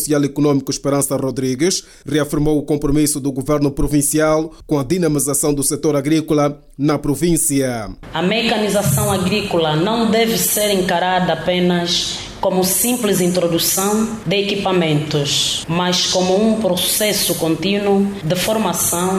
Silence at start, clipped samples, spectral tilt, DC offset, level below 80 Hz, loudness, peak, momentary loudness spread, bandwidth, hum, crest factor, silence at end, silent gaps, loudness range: 0 s; under 0.1%; -4 dB/octave; under 0.1%; -38 dBFS; -16 LUFS; -6 dBFS; 5 LU; 17 kHz; none; 12 dB; 0 s; none; 2 LU